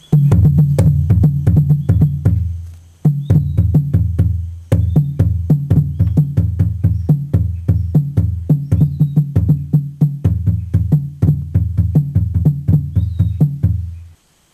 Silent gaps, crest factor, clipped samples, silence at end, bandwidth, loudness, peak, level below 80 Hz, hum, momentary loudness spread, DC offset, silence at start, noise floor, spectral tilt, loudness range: none; 14 dB; under 0.1%; 0.45 s; 12.5 kHz; -15 LUFS; 0 dBFS; -30 dBFS; none; 6 LU; under 0.1%; 0.1 s; -44 dBFS; -10.5 dB/octave; 2 LU